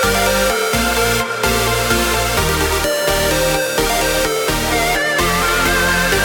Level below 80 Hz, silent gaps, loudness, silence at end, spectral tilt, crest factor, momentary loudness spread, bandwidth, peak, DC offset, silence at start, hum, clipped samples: -28 dBFS; none; -15 LUFS; 0 s; -3 dB/octave; 12 dB; 2 LU; 19.5 kHz; -2 dBFS; under 0.1%; 0 s; none; under 0.1%